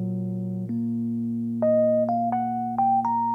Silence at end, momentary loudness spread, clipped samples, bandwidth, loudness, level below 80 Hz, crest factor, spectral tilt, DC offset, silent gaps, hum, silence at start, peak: 0 s; 8 LU; under 0.1%; 2.6 kHz; -25 LUFS; -66 dBFS; 10 dB; -11.5 dB/octave; under 0.1%; none; none; 0 s; -14 dBFS